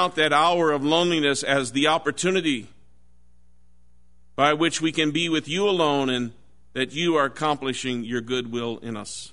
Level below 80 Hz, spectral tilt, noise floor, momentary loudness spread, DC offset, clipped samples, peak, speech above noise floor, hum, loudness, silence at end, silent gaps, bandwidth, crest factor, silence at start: -58 dBFS; -4 dB/octave; -60 dBFS; 10 LU; 0.5%; under 0.1%; -4 dBFS; 38 dB; none; -23 LUFS; 0.05 s; none; 11 kHz; 20 dB; 0 s